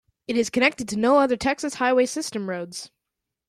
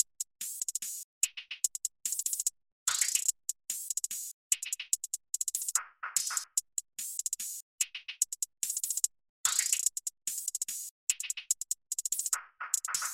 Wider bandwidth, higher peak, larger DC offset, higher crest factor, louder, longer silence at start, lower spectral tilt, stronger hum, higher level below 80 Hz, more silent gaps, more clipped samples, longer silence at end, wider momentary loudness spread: second, 14 kHz vs 17 kHz; first, -6 dBFS vs -10 dBFS; neither; second, 18 dB vs 26 dB; first, -23 LUFS vs -32 LUFS; first, 0.3 s vs 0 s; first, -3.5 dB/octave vs 5 dB/octave; neither; first, -58 dBFS vs -78 dBFS; second, none vs 1.04-1.21 s, 2.72-2.86 s, 4.33-4.50 s, 7.62-7.78 s, 9.29-9.44 s, 10.91-11.07 s; neither; first, 0.65 s vs 0 s; first, 12 LU vs 8 LU